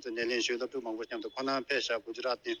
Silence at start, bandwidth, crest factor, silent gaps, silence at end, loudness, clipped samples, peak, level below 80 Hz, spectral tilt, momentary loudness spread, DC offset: 0 s; 11 kHz; 18 dB; none; 0 s; -34 LUFS; under 0.1%; -16 dBFS; -74 dBFS; -2 dB/octave; 7 LU; under 0.1%